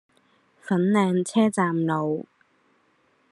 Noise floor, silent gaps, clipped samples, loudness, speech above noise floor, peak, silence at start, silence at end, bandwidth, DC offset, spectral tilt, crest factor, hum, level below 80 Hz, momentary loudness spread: -65 dBFS; none; under 0.1%; -23 LUFS; 43 dB; -8 dBFS; 0.65 s; 1.1 s; 11.5 kHz; under 0.1%; -6.5 dB/octave; 18 dB; none; -72 dBFS; 9 LU